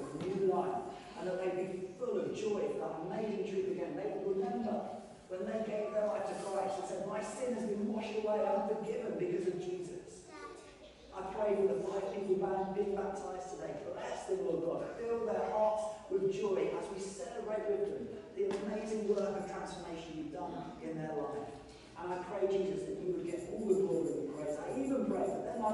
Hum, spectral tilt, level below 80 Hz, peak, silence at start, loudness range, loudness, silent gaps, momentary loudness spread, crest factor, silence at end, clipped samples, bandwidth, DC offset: none; -6 dB/octave; -66 dBFS; -20 dBFS; 0 s; 3 LU; -37 LUFS; none; 10 LU; 18 dB; 0 s; under 0.1%; 11.5 kHz; under 0.1%